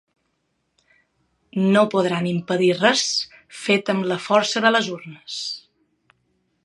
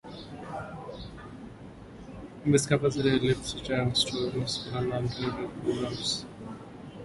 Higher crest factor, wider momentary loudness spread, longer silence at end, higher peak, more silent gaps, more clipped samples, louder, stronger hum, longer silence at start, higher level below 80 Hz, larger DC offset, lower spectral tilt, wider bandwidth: about the same, 22 dB vs 22 dB; second, 14 LU vs 19 LU; first, 1.05 s vs 0 s; first, -2 dBFS vs -10 dBFS; neither; neither; first, -20 LUFS vs -29 LUFS; neither; first, 1.55 s vs 0.05 s; second, -70 dBFS vs -52 dBFS; neither; about the same, -4 dB/octave vs -5 dB/octave; about the same, 11.5 kHz vs 11.5 kHz